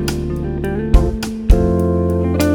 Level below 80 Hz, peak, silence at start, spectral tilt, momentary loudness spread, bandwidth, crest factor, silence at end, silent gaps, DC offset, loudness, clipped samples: -18 dBFS; 0 dBFS; 0 s; -7 dB/octave; 7 LU; 19 kHz; 14 dB; 0 s; none; under 0.1%; -17 LUFS; under 0.1%